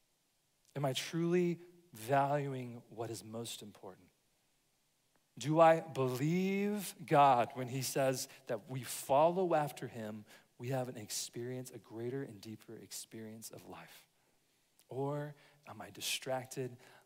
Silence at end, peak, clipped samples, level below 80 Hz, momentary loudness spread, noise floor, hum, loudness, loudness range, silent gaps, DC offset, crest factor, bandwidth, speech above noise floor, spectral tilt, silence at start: 0.3 s; -14 dBFS; under 0.1%; -84 dBFS; 21 LU; -78 dBFS; none; -35 LUFS; 14 LU; none; under 0.1%; 22 dB; 16 kHz; 42 dB; -5 dB/octave; 0.75 s